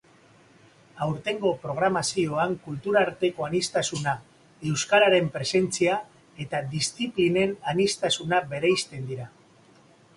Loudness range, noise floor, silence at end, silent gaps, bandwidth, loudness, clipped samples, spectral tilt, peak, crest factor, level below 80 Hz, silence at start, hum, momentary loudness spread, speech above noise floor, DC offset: 2 LU; -56 dBFS; 0.9 s; none; 11.5 kHz; -25 LUFS; under 0.1%; -4 dB/octave; -6 dBFS; 20 dB; -62 dBFS; 0.95 s; none; 10 LU; 31 dB; under 0.1%